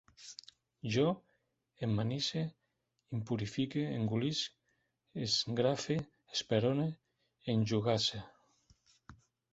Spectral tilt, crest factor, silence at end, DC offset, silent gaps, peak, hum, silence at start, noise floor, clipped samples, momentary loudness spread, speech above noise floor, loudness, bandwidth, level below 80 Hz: -5 dB/octave; 20 dB; 0.4 s; under 0.1%; none; -16 dBFS; none; 0.2 s; -82 dBFS; under 0.1%; 14 LU; 48 dB; -35 LUFS; 8 kHz; -68 dBFS